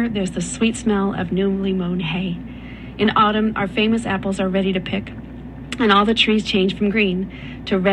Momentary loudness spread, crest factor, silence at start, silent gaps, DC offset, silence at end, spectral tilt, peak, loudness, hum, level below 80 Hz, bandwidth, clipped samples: 16 LU; 18 dB; 0 s; none; under 0.1%; 0 s; -5.5 dB/octave; -2 dBFS; -19 LUFS; none; -40 dBFS; 11 kHz; under 0.1%